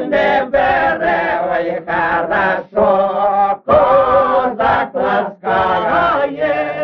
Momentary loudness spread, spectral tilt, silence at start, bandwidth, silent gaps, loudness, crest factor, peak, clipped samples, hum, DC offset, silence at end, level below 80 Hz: 6 LU; -3 dB/octave; 0 s; 6.2 kHz; none; -14 LUFS; 14 dB; 0 dBFS; under 0.1%; none; under 0.1%; 0 s; -42 dBFS